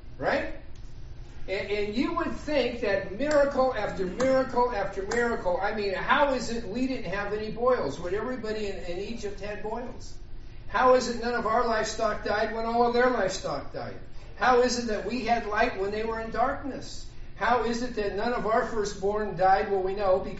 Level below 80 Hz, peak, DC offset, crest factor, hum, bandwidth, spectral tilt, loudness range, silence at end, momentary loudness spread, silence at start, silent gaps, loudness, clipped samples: -42 dBFS; -8 dBFS; under 0.1%; 20 dB; none; 8 kHz; -3 dB/octave; 4 LU; 0 s; 15 LU; 0 s; none; -27 LUFS; under 0.1%